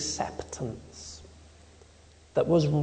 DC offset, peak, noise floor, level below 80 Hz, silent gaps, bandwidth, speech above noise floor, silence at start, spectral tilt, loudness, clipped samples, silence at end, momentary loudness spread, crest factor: under 0.1%; -12 dBFS; -55 dBFS; -52 dBFS; none; 9.4 kHz; 28 dB; 0 s; -5.5 dB/octave; -29 LUFS; under 0.1%; 0 s; 19 LU; 18 dB